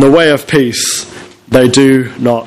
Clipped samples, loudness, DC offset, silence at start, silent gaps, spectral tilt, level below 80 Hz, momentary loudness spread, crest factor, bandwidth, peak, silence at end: 1%; -10 LUFS; under 0.1%; 0 s; none; -4.5 dB/octave; -44 dBFS; 8 LU; 10 dB; 15.5 kHz; 0 dBFS; 0 s